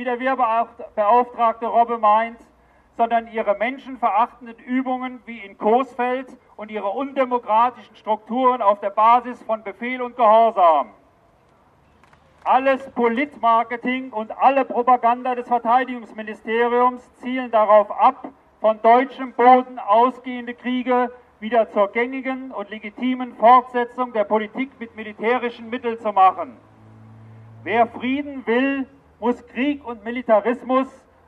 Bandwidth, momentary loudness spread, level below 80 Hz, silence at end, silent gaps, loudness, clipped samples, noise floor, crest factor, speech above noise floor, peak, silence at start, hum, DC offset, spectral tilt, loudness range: 5.2 kHz; 14 LU; -64 dBFS; 0.4 s; none; -20 LUFS; under 0.1%; -56 dBFS; 20 dB; 36 dB; 0 dBFS; 0 s; none; under 0.1%; -6.5 dB/octave; 5 LU